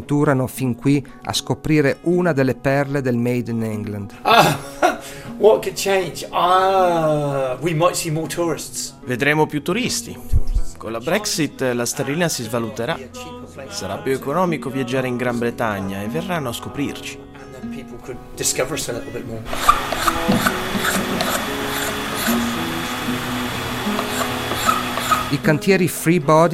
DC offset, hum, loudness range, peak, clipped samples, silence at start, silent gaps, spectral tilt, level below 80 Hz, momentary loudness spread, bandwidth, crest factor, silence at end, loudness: under 0.1%; none; 5 LU; 0 dBFS; under 0.1%; 0 s; none; -4.5 dB/octave; -36 dBFS; 12 LU; 16 kHz; 20 dB; 0 s; -20 LUFS